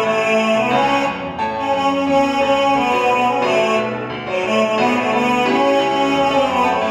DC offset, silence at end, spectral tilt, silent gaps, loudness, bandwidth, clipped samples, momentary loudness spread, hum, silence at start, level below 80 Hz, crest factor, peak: under 0.1%; 0 s; -4.5 dB/octave; none; -16 LUFS; 13.5 kHz; under 0.1%; 6 LU; none; 0 s; -50 dBFS; 12 dB; -4 dBFS